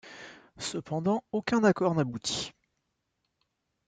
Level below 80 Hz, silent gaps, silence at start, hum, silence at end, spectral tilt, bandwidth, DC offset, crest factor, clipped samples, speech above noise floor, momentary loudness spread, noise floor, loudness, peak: -66 dBFS; none; 0.05 s; none; 1.4 s; -5 dB/octave; 9.4 kHz; under 0.1%; 20 dB; under 0.1%; 52 dB; 19 LU; -80 dBFS; -29 LUFS; -12 dBFS